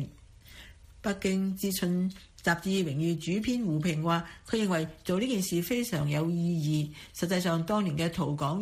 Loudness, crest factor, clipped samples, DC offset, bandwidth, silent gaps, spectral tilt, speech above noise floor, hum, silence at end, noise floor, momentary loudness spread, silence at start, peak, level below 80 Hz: -30 LUFS; 16 dB; under 0.1%; under 0.1%; 15.5 kHz; none; -5.5 dB/octave; 23 dB; none; 0 s; -52 dBFS; 7 LU; 0 s; -14 dBFS; -56 dBFS